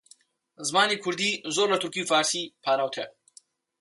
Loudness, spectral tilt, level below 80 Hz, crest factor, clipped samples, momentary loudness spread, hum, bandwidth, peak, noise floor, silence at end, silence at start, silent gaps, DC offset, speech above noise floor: -25 LUFS; -2 dB/octave; -78 dBFS; 18 dB; under 0.1%; 9 LU; none; 11.5 kHz; -10 dBFS; -59 dBFS; 0.7 s; 0.6 s; none; under 0.1%; 33 dB